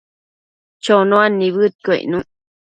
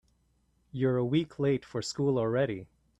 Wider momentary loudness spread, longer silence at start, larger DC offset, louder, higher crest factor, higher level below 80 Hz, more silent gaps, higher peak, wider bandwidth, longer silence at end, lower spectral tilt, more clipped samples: first, 11 LU vs 8 LU; about the same, 0.85 s vs 0.75 s; neither; first, -15 LUFS vs -30 LUFS; about the same, 18 dB vs 16 dB; about the same, -60 dBFS vs -64 dBFS; first, 1.75-1.79 s vs none; first, 0 dBFS vs -16 dBFS; second, 9.2 kHz vs 11 kHz; first, 0.55 s vs 0.35 s; about the same, -6 dB/octave vs -6.5 dB/octave; neither